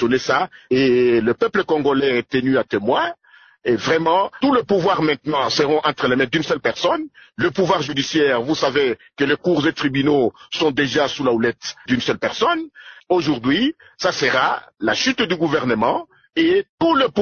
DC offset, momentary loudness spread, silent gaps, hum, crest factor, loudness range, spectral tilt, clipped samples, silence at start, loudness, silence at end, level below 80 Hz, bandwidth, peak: under 0.1%; 5 LU; 16.69-16.78 s; none; 14 dB; 2 LU; -5 dB/octave; under 0.1%; 0 s; -19 LUFS; 0 s; -54 dBFS; 6.8 kHz; -4 dBFS